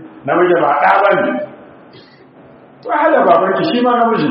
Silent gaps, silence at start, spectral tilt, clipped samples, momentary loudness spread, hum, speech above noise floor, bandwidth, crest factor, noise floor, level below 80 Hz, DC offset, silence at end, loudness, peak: none; 0 s; -3.5 dB/octave; under 0.1%; 10 LU; none; 30 dB; 5.6 kHz; 14 dB; -42 dBFS; -62 dBFS; under 0.1%; 0 s; -13 LUFS; 0 dBFS